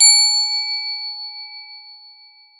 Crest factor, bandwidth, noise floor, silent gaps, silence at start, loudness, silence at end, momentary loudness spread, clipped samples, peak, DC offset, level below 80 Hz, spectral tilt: 20 dB; 15.5 kHz; -48 dBFS; none; 0 s; -15 LUFS; 0.65 s; 24 LU; under 0.1%; 0 dBFS; under 0.1%; under -90 dBFS; 15.5 dB/octave